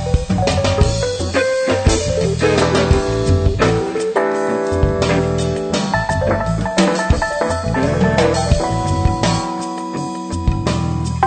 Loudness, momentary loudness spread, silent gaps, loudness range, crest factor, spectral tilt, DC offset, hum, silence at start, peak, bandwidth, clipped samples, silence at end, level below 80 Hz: -17 LUFS; 5 LU; none; 2 LU; 14 dB; -5.5 dB/octave; under 0.1%; none; 0 s; -2 dBFS; 9.2 kHz; under 0.1%; 0 s; -26 dBFS